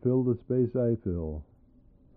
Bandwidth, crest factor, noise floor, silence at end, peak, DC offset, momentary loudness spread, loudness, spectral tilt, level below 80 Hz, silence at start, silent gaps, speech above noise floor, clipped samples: 2.6 kHz; 14 dB; -59 dBFS; 0.75 s; -14 dBFS; under 0.1%; 11 LU; -29 LUFS; -13.5 dB/octave; -48 dBFS; 0.05 s; none; 31 dB; under 0.1%